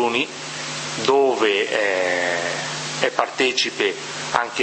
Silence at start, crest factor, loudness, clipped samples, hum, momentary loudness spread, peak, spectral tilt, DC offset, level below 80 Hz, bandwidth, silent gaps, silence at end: 0 s; 22 dB; -21 LUFS; under 0.1%; none; 8 LU; 0 dBFS; -2.5 dB/octave; under 0.1%; -66 dBFS; 8.8 kHz; none; 0 s